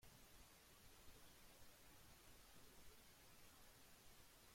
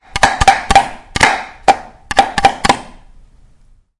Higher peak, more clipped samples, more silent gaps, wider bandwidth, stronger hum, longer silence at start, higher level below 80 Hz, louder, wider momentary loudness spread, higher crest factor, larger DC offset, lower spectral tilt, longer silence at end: second, -50 dBFS vs 0 dBFS; second, under 0.1% vs 0.5%; neither; first, 16.5 kHz vs 12 kHz; neither; second, 0 s vs 0.15 s; second, -74 dBFS vs -30 dBFS; second, -67 LUFS vs -13 LUFS; second, 1 LU vs 6 LU; about the same, 16 dB vs 14 dB; neither; about the same, -2.5 dB/octave vs -2.5 dB/octave; second, 0 s vs 1.15 s